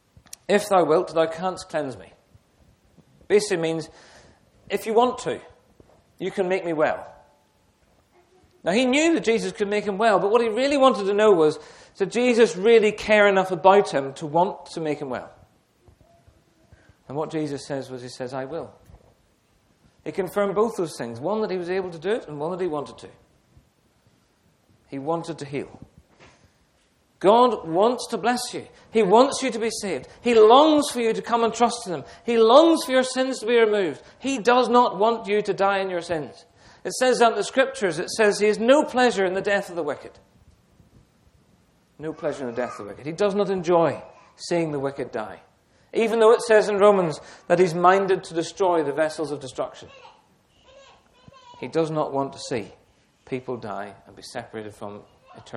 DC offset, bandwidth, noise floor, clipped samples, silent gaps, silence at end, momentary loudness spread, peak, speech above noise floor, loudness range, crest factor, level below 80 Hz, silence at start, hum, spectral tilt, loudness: under 0.1%; 15 kHz; -63 dBFS; under 0.1%; none; 0 s; 17 LU; -2 dBFS; 42 dB; 14 LU; 22 dB; -62 dBFS; 0.5 s; none; -4.5 dB/octave; -22 LUFS